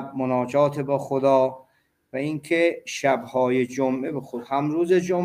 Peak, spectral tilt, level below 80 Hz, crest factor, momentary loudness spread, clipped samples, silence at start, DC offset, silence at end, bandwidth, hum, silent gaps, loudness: -6 dBFS; -6 dB/octave; -68 dBFS; 16 dB; 8 LU; under 0.1%; 0 s; under 0.1%; 0 s; 15.5 kHz; none; none; -23 LUFS